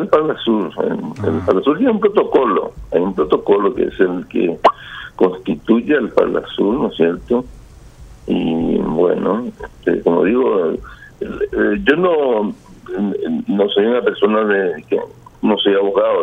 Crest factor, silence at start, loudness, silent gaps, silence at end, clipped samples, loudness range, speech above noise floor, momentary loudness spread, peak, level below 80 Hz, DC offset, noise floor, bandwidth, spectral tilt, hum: 16 dB; 0 s; -16 LUFS; none; 0 s; under 0.1%; 2 LU; 23 dB; 8 LU; 0 dBFS; -44 dBFS; under 0.1%; -39 dBFS; 7.4 kHz; -7.5 dB/octave; none